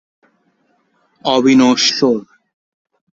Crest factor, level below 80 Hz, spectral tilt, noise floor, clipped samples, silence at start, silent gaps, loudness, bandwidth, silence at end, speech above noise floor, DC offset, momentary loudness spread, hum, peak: 16 dB; -60 dBFS; -3.5 dB/octave; -61 dBFS; under 0.1%; 1.25 s; none; -13 LUFS; 7.8 kHz; 0.95 s; 49 dB; under 0.1%; 11 LU; none; -2 dBFS